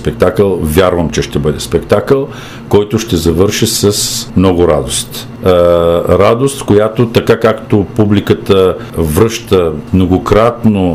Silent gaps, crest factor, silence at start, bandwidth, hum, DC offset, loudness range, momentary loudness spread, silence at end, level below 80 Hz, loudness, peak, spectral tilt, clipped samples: none; 10 dB; 0 s; 16 kHz; none; 0.4%; 2 LU; 5 LU; 0 s; -30 dBFS; -11 LUFS; 0 dBFS; -5.5 dB/octave; 0.3%